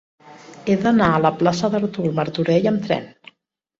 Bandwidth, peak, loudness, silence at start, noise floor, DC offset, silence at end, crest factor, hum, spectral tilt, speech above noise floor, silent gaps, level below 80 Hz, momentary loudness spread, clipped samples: 7.8 kHz; -2 dBFS; -19 LUFS; 0.25 s; -65 dBFS; under 0.1%; 0.7 s; 18 dB; none; -7 dB/octave; 47 dB; none; -52 dBFS; 7 LU; under 0.1%